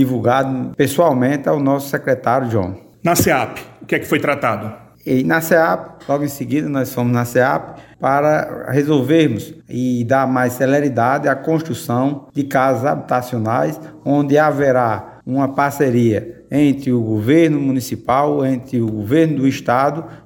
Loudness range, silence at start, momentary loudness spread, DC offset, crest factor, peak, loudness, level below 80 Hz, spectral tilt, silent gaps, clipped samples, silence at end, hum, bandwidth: 2 LU; 0 s; 8 LU; under 0.1%; 16 dB; -2 dBFS; -17 LUFS; -52 dBFS; -6.5 dB/octave; none; under 0.1%; 0.1 s; none; 17 kHz